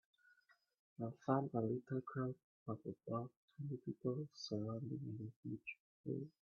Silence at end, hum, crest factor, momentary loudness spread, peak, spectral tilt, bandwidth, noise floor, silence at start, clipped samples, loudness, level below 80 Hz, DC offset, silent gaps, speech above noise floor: 0.15 s; none; 24 dB; 11 LU; -22 dBFS; -7 dB/octave; 6.8 kHz; -75 dBFS; 1 s; under 0.1%; -46 LUFS; -82 dBFS; under 0.1%; 2.44-2.66 s, 3.36-3.48 s, 5.36-5.43 s, 5.80-6.04 s; 31 dB